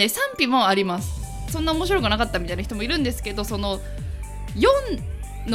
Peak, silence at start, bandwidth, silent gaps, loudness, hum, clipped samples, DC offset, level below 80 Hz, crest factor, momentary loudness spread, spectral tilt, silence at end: -2 dBFS; 0 s; 16.5 kHz; none; -23 LUFS; none; under 0.1%; under 0.1%; -32 dBFS; 22 dB; 14 LU; -4.5 dB/octave; 0 s